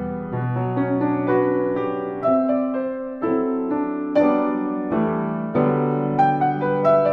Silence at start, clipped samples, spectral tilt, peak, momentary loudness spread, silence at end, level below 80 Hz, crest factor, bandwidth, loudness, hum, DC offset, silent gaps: 0 s; under 0.1%; -10.5 dB/octave; -6 dBFS; 6 LU; 0 s; -56 dBFS; 14 dB; 5.8 kHz; -21 LUFS; none; under 0.1%; none